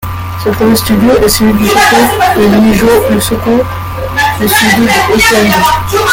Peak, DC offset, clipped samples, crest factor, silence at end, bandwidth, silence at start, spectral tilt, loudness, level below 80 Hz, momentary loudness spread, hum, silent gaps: 0 dBFS; under 0.1%; 0.1%; 8 dB; 0 s; 17.5 kHz; 0 s; -4 dB/octave; -8 LUFS; -28 dBFS; 7 LU; none; none